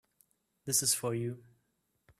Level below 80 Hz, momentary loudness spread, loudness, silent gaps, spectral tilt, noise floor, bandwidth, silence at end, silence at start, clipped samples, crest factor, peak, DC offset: -74 dBFS; 20 LU; -31 LUFS; none; -3 dB/octave; -79 dBFS; 15.5 kHz; 0.8 s; 0.65 s; under 0.1%; 22 dB; -14 dBFS; under 0.1%